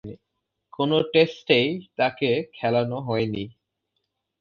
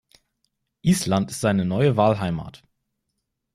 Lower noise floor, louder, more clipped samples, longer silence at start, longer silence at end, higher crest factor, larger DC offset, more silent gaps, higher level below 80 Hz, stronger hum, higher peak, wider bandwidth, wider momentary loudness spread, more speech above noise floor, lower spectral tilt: about the same, -79 dBFS vs -78 dBFS; about the same, -23 LUFS vs -22 LUFS; neither; second, 0.05 s vs 0.85 s; second, 0.9 s vs 1.05 s; about the same, 20 dB vs 18 dB; neither; neither; second, -62 dBFS vs -54 dBFS; neither; about the same, -4 dBFS vs -6 dBFS; second, 6.8 kHz vs 15.5 kHz; about the same, 9 LU vs 10 LU; about the same, 56 dB vs 57 dB; about the same, -7 dB/octave vs -6 dB/octave